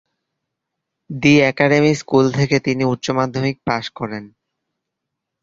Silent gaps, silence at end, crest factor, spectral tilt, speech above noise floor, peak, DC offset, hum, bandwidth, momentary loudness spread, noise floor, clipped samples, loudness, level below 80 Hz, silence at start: none; 1.15 s; 18 dB; -6 dB/octave; 63 dB; 0 dBFS; under 0.1%; none; 7.8 kHz; 14 LU; -80 dBFS; under 0.1%; -17 LUFS; -52 dBFS; 1.1 s